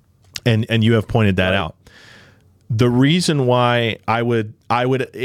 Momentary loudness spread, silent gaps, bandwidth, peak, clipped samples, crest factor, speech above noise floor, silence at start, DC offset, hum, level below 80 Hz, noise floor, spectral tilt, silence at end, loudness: 7 LU; none; 14 kHz; -2 dBFS; under 0.1%; 16 dB; 34 dB; 0.35 s; under 0.1%; none; -46 dBFS; -50 dBFS; -6 dB/octave; 0 s; -17 LUFS